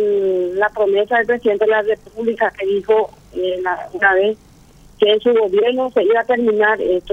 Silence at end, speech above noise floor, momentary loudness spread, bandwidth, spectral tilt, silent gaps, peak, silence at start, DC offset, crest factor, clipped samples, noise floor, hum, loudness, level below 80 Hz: 0 s; 29 dB; 7 LU; 6.8 kHz; -5.5 dB/octave; none; 0 dBFS; 0 s; under 0.1%; 16 dB; under 0.1%; -45 dBFS; none; -16 LUFS; -52 dBFS